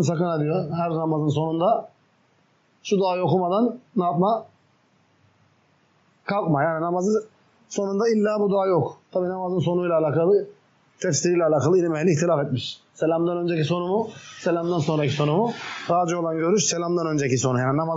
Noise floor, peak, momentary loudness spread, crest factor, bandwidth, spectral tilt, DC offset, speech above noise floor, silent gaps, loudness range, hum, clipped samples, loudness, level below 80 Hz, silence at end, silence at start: -63 dBFS; -10 dBFS; 7 LU; 14 dB; 8 kHz; -6 dB/octave; under 0.1%; 41 dB; none; 4 LU; none; under 0.1%; -23 LUFS; -70 dBFS; 0 s; 0 s